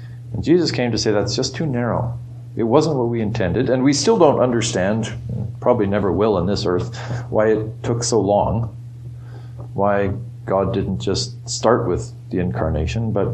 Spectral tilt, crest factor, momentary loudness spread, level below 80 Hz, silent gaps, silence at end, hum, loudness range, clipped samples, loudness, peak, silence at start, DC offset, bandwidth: -5.5 dB/octave; 18 dB; 11 LU; -40 dBFS; none; 0 s; none; 4 LU; under 0.1%; -19 LUFS; 0 dBFS; 0 s; under 0.1%; 9.4 kHz